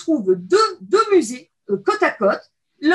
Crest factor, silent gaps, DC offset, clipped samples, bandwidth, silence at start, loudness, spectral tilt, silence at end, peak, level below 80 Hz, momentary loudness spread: 14 dB; none; under 0.1%; under 0.1%; 12 kHz; 0 s; -19 LUFS; -4.5 dB/octave; 0 s; -4 dBFS; -72 dBFS; 11 LU